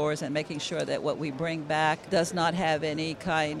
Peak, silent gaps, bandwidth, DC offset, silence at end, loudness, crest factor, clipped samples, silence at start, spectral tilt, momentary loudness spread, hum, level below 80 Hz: -12 dBFS; none; 13.5 kHz; under 0.1%; 0 s; -29 LUFS; 16 dB; under 0.1%; 0 s; -4.5 dB/octave; 6 LU; none; -60 dBFS